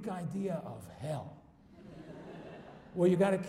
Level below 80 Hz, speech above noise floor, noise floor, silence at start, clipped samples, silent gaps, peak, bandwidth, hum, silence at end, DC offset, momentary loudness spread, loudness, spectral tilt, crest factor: -68 dBFS; 23 dB; -56 dBFS; 0 s; under 0.1%; none; -16 dBFS; 14 kHz; none; 0 s; under 0.1%; 23 LU; -34 LUFS; -7.5 dB/octave; 18 dB